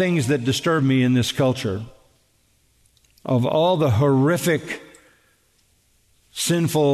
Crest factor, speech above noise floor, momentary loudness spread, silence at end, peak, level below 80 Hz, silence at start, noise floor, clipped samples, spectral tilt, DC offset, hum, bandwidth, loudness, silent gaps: 14 dB; 43 dB; 15 LU; 0 s; -8 dBFS; -58 dBFS; 0 s; -62 dBFS; under 0.1%; -5.5 dB/octave; under 0.1%; none; 13.5 kHz; -20 LUFS; none